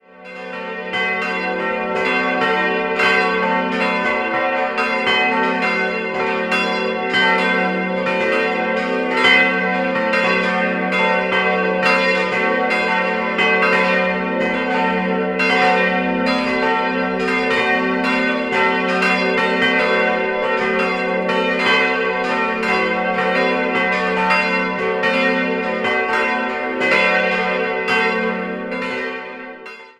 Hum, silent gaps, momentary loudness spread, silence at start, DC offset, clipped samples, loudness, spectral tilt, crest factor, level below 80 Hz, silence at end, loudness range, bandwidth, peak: none; none; 6 LU; 0.2 s; under 0.1%; under 0.1%; -17 LUFS; -5 dB/octave; 16 dB; -54 dBFS; 0.1 s; 2 LU; 12.5 kHz; -2 dBFS